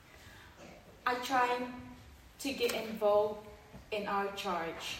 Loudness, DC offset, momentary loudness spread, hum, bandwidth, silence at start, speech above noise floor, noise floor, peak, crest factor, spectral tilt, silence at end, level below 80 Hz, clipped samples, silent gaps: -34 LUFS; under 0.1%; 23 LU; none; 16 kHz; 0.1 s; 21 dB; -55 dBFS; -18 dBFS; 18 dB; -3.5 dB/octave; 0 s; -64 dBFS; under 0.1%; none